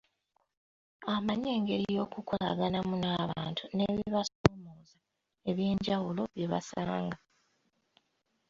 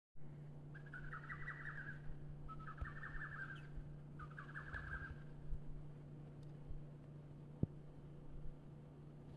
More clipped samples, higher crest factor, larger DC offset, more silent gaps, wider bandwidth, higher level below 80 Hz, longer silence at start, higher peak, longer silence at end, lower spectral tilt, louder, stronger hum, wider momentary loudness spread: neither; first, 32 dB vs 26 dB; neither; first, 4.35-4.44 s vs none; second, 7.6 kHz vs 9.4 kHz; about the same, -58 dBFS vs -58 dBFS; first, 1 s vs 0.15 s; first, -2 dBFS vs -24 dBFS; first, 1.35 s vs 0 s; second, -6.5 dB/octave vs -8 dB/octave; first, -33 LUFS vs -53 LUFS; neither; about the same, 7 LU vs 9 LU